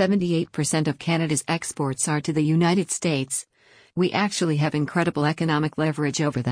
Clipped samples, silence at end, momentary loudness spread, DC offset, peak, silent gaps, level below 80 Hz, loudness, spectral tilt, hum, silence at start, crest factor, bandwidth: under 0.1%; 0 s; 4 LU; under 0.1%; -8 dBFS; none; -60 dBFS; -23 LUFS; -5 dB/octave; none; 0 s; 16 dB; 10.5 kHz